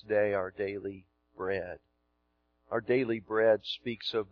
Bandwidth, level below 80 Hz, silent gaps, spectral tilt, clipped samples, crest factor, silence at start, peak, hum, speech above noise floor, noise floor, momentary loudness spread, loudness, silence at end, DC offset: 5.4 kHz; -68 dBFS; none; -3 dB/octave; under 0.1%; 18 dB; 0.05 s; -14 dBFS; 60 Hz at -70 dBFS; 45 dB; -76 dBFS; 15 LU; -32 LUFS; 0.05 s; under 0.1%